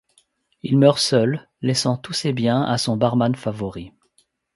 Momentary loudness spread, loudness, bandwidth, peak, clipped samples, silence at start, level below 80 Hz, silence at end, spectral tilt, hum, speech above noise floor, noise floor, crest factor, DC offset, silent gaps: 13 LU; -20 LUFS; 11.5 kHz; -2 dBFS; under 0.1%; 0.65 s; -56 dBFS; 0.65 s; -5.5 dB/octave; none; 45 dB; -64 dBFS; 20 dB; under 0.1%; none